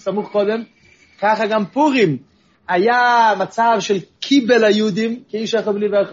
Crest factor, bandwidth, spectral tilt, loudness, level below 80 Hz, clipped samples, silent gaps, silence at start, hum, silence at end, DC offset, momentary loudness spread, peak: 16 dB; 7.6 kHz; -3 dB/octave; -17 LUFS; -66 dBFS; under 0.1%; none; 0.05 s; none; 0 s; under 0.1%; 9 LU; -2 dBFS